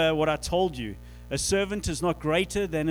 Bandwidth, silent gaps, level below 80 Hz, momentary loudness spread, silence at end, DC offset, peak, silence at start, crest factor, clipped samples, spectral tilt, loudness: over 20 kHz; none; -42 dBFS; 10 LU; 0 s; under 0.1%; -10 dBFS; 0 s; 16 dB; under 0.1%; -4.5 dB/octave; -27 LUFS